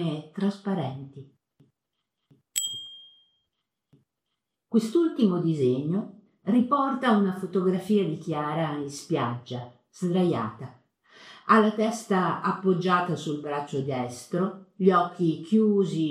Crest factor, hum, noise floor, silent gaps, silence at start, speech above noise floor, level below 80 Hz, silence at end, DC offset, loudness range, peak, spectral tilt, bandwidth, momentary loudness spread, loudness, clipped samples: 20 dB; none; -83 dBFS; none; 0 s; 58 dB; -76 dBFS; 0 s; under 0.1%; 9 LU; -6 dBFS; -6 dB/octave; 15.5 kHz; 14 LU; -26 LUFS; under 0.1%